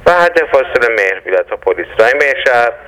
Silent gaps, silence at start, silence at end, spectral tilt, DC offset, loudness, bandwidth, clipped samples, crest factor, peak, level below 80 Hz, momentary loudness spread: none; 0 s; 0.05 s; -3.5 dB/octave; under 0.1%; -11 LUFS; 14 kHz; 0.2%; 12 dB; 0 dBFS; -44 dBFS; 6 LU